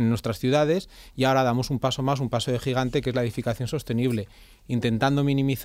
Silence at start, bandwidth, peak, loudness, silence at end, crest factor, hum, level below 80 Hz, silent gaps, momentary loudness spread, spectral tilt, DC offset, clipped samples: 0 s; 16 kHz; -8 dBFS; -25 LUFS; 0 s; 16 dB; none; -48 dBFS; none; 7 LU; -6.5 dB/octave; under 0.1%; under 0.1%